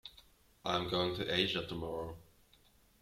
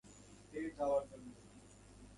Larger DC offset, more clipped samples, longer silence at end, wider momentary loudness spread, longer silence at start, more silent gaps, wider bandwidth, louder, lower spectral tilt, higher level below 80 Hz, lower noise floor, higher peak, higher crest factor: neither; neither; first, 0.8 s vs 0 s; second, 15 LU vs 23 LU; about the same, 0.05 s vs 0.05 s; neither; first, 16 kHz vs 11.5 kHz; first, -36 LUFS vs -41 LUFS; about the same, -5 dB/octave vs -5.5 dB/octave; about the same, -62 dBFS vs -66 dBFS; first, -67 dBFS vs -60 dBFS; first, -16 dBFS vs -26 dBFS; about the same, 22 dB vs 18 dB